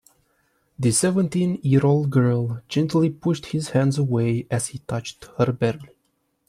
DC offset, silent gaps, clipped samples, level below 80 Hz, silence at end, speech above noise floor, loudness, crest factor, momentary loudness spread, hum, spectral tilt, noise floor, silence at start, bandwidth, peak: under 0.1%; none; under 0.1%; -56 dBFS; 0.65 s; 49 dB; -22 LUFS; 16 dB; 8 LU; none; -6 dB/octave; -70 dBFS; 0.8 s; 13.5 kHz; -6 dBFS